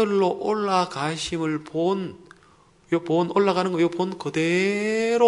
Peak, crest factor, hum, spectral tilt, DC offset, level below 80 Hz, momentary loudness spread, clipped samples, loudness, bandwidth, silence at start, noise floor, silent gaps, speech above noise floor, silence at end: -6 dBFS; 18 dB; none; -5.5 dB/octave; under 0.1%; -60 dBFS; 6 LU; under 0.1%; -24 LUFS; 11 kHz; 0 s; -56 dBFS; none; 33 dB; 0 s